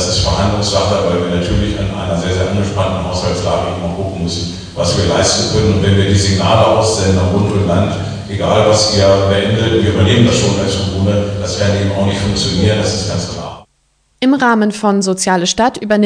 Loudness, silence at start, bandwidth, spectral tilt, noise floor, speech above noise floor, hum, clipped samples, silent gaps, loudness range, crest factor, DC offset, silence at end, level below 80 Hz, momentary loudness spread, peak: -13 LUFS; 0 s; 10 kHz; -5 dB/octave; -58 dBFS; 46 dB; none; under 0.1%; none; 4 LU; 14 dB; under 0.1%; 0 s; -32 dBFS; 8 LU; 0 dBFS